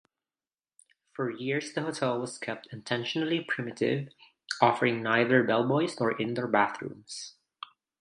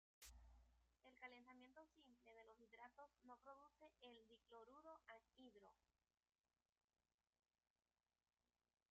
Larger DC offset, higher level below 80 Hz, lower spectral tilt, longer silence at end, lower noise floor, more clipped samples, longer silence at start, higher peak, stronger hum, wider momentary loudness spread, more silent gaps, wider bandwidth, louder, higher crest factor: neither; first, -76 dBFS vs -82 dBFS; first, -5 dB/octave vs -2 dB/octave; second, 0.7 s vs 3 s; about the same, under -90 dBFS vs under -90 dBFS; neither; first, 1.2 s vs 0.2 s; first, -4 dBFS vs -48 dBFS; neither; first, 18 LU vs 6 LU; neither; first, 11.5 kHz vs 7 kHz; first, -29 LUFS vs -67 LUFS; about the same, 26 dB vs 22 dB